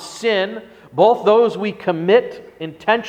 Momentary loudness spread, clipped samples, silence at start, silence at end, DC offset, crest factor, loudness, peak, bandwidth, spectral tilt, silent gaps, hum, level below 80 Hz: 18 LU; under 0.1%; 0 s; 0 s; under 0.1%; 18 dB; -17 LUFS; 0 dBFS; 9.8 kHz; -5 dB/octave; none; none; -62 dBFS